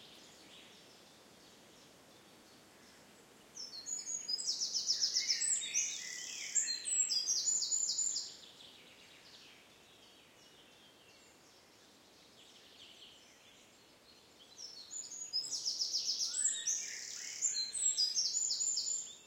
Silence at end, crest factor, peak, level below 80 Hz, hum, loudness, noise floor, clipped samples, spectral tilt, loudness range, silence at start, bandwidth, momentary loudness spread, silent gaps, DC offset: 0 s; 22 dB; -20 dBFS; -86 dBFS; none; -34 LUFS; -63 dBFS; under 0.1%; 3 dB/octave; 17 LU; 0 s; 16.5 kHz; 24 LU; none; under 0.1%